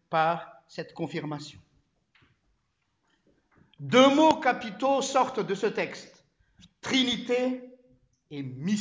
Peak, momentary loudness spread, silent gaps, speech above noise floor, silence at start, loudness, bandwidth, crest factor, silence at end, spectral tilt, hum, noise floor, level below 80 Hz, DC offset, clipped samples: -6 dBFS; 20 LU; none; 50 dB; 0.1 s; -26 LUFS; 8 kHz; 22 dB; 0 s; -4.5 dB/octave; none; -76 dBFS; -68 dBFS; under 0.1%; under 0.1%